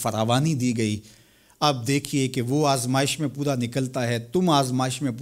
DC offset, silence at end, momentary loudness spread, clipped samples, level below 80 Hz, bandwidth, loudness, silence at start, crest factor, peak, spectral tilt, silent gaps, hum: under 0.1%; 0 s; 5 LU; under 0.1%; -60 dBFS; 16 kHz; -24 LUFS; 0 s; 18 dB; -6 dBFS; -5 dB/octave; none; none